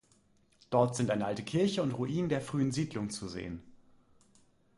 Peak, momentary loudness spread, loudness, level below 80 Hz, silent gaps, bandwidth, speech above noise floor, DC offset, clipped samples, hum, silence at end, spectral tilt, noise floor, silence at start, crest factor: -14 dBFS; 11 LU; -33 LUFS; -62 dBFS; none; 11.5 kHz; 36 dB; under 0.1%; under 0.1%; none; 1 s; -6 dB/octave; -68 dBFS; 0.7 s; 20 dB